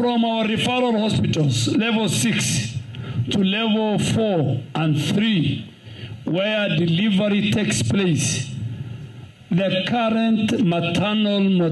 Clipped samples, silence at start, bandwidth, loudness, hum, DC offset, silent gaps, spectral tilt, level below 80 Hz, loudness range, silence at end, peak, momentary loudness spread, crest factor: under 0.1%; 0 s; 12.5 kHz; -20 LUFS; none; under 0.1%; none; -5 dB/octave; -52 dBFS; 1 LU; 0 s; -12 dBFS; 11 LU; 10 dB